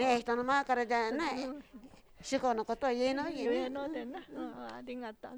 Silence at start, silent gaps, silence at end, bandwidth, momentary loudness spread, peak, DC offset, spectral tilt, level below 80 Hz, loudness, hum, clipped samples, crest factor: 0 s; none; 0 s; over 20 kHz; 13 LU; -16 dBFS; under 0.1%; -3.5 dB/octave; -64 dBFS; -34 LUFS; none; under 0.1%; 18 dB